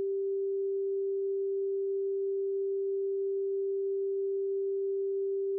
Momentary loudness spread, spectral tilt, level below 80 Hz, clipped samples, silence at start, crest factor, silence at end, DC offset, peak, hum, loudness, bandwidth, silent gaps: 0 LU; -3 dB/octave; under -90 dBFS; under 0.1%; 0 s; 4 dB; 0 s; under 0.1%; -28 dBFS; none; -32 LUFS; 0.5 kHz; none